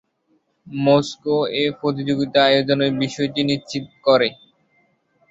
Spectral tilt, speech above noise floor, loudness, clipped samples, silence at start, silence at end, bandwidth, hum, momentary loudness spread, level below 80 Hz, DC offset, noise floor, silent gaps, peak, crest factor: -5.5 dB/octave; 46 dB; -19 LUFS; under 0.1%; 0.7 s; 0.95 s; 7.8 kHz; none; 8 LU; -60 dBFS; under 0.1%; -65 dBFS; none; -2 dBFS; 18 dB